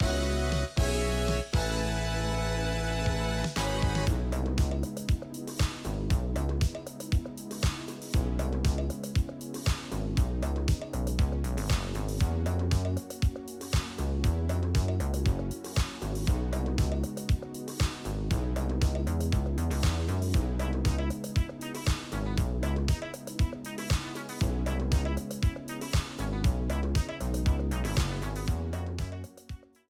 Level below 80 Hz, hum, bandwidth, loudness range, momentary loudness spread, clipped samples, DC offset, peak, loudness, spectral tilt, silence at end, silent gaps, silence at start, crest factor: -34 dBFS; none; 16.5 kHz; 2 LU; 5 LU; under 0.1%; under 0.1%; -14 dBFS; -31 LUFS; -5.5 dB/octave; 0.35 s; none; 0 s; 14 dB